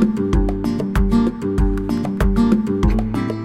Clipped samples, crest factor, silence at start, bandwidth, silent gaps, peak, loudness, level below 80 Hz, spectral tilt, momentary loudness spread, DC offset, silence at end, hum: under 0.1%; 16 dB; 0 s; 14 kHz; none; -2 dBFS; -19 LUFS; -22 dBFS; -8 dB/octave; 5 LU; under 0.1%; 0 s; none